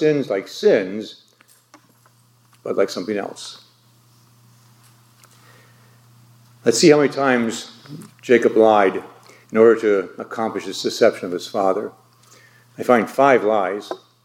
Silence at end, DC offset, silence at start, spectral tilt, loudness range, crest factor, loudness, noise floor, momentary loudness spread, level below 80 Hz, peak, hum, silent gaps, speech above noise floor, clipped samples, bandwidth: 0.3 s; under 0.1%; 0 s; -4.5 dB/octave; 11 LU; 20 dB; -18 LUFS; -55 dBFS; 20 LU; -74 dBFS; 0 dBFS; none; none; 37 dB; under 0.1%; 16.5 kHz